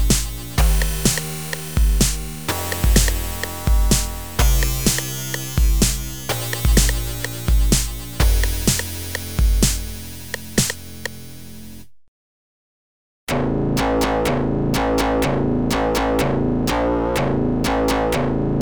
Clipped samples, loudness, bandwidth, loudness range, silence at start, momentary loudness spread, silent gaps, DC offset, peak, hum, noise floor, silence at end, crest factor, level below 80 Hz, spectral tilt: under 0.1%; -20 LUFS; over 20 kHz; 6 LU; 0 s; 9 LU; 12.08-13.27 s; 1%; -2 dBFS; none; -40 dBFS; 0 s; 18 dB; -22 dBFS; -4.5 dB/octave